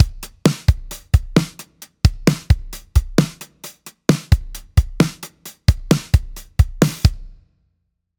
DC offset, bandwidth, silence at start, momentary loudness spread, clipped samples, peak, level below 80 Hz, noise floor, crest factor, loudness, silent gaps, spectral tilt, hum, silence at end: under 0.1%; over 20 kHz; 0 s; 18 LU; under 0.1%; 0 dBFS; -24 dBFS; -71 dBFS; 18 dB; -19 LUFS; none; -6 dB/octave; none; 0.9 s